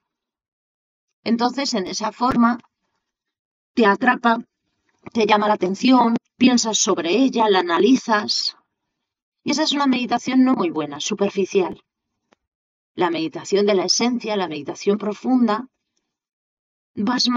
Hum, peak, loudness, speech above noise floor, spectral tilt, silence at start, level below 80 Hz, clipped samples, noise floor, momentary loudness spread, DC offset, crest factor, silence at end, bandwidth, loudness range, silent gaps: none; -2 dBFS; -19 LUFS; 60 dB; -3.5 dB/octave; 1.25 s; -62 dBFS; under 0.1%; -79 dBFS; 9 LU; under 0.1%; 20 dB; 0 s; 7.8 kHz; 6 LU; 3.39-3.75 s, 9.22-9.32 s, 12.47-12.95 s, 16.33-16.94 s